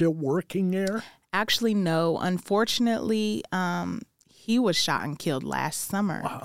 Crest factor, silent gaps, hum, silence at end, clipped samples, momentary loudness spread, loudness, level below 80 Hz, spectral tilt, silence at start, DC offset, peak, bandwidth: 16 dB; none; none; 0 s; under 0.1%; 7 LU; -26 LUFS; -62 dBFS; -4.5 dB/octave; 0 s; 0.2%; -10 dBFS; 16.5 kHz